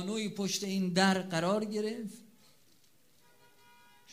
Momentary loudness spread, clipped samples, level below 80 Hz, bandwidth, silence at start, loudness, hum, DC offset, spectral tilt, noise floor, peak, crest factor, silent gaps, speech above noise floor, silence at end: 14 LU; under 0.1%; -76 dBFS; 15.5 kHz; 0 s; -32 LUFS; none; under 0.1%; -4.5 dB/octave; -68 dBFS; -12 dBFS; 22 dB; none; 36 dB; 0 s